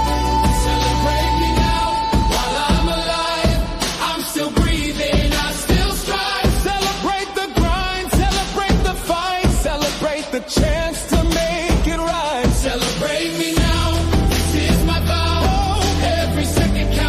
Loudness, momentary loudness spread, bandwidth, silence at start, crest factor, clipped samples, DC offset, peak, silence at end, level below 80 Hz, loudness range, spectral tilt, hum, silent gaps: -18 LUFS; 3 LU; 15.5 kHz; 0 s; 14 dB; under 0.1%; under 0.1%; -4 dBFS; 0 s; -22 dBFS; 2 LU; -4.5 dB/octave; none; none